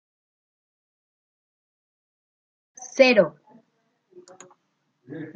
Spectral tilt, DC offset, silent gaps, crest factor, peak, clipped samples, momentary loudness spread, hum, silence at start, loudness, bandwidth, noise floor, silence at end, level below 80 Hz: -4 dB/octave; under 0.1%; none; 26 dB; -2 dBFS; under 0.1%; 25 LU; none; 2.8 s; -19 LUFS; 7.6 kHz; -73 dBFS; 0.05 s; -78 dBFS